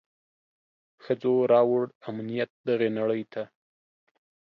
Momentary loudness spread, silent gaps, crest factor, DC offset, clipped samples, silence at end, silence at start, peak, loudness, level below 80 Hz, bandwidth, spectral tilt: 15 LU; 1.95-2.01 s, 2.50-2.64 s; 18 dB; under 0.1%; under 0.1%; 1.15 s; 1.05 s; -10 dBFS; -26 LUFS; -78 dBFS; 5.6 kHz; -9 dB/octave